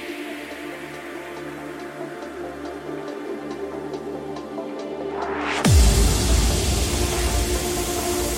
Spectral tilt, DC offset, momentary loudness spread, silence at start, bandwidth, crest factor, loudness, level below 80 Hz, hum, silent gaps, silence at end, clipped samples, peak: -4.5 dB/octave; under 0.1%; 15 LU; 0 s; 16.5 kHz; 18 dB; -24 LUFS; -26 dBFS; none; none; 0 s; under 0.1%; -6 dBFS